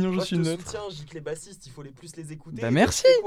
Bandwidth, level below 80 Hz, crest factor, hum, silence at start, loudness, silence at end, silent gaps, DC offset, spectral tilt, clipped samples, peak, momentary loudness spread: 15.5 kHz; -52 dBFS; 20 dB; none; 0 s; -25 LUFS; 0 s; none; under 0.1%; -5 dB/octave; under 0.1%; -4 dBFS; 23 LU